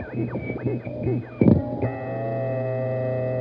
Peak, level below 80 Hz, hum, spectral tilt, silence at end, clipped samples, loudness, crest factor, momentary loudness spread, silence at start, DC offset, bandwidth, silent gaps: -4 dBFS; -48 dBFS; none; -12.5 dB/octave; 0 s; under 0.1%; -25 LUFS; 20 dB; 9 LU; 0 s; under 0.1%; 5 kHz; none